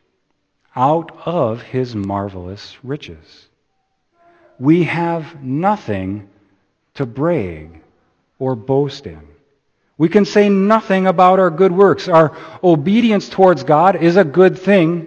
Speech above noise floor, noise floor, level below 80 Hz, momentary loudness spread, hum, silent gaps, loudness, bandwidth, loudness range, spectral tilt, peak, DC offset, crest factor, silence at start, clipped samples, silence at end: 52 dB; -67 dBFS; -54 dBFS; 16 LU; none; none; -15 LUFS; 8.2 kHz; 10 LU; -7.5 dB/octave; 0 dBFS; under 0.1%; 16 dB; 0.75 s; under 0.1%; 0 s